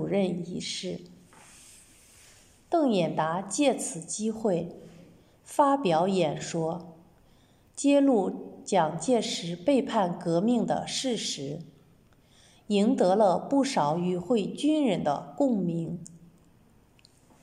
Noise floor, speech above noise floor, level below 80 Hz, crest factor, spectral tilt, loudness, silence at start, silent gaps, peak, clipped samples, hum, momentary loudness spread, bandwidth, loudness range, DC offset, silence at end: -60 dBFS; 34 dB; -68 dBFS; 18 dB; -5 dB/octave; -27 LUFS; 0 s; none; -10 dBFS; under 0.1%; none; 11 LU; 13 kHz; 4 LU; under 0.1%; 1.25 s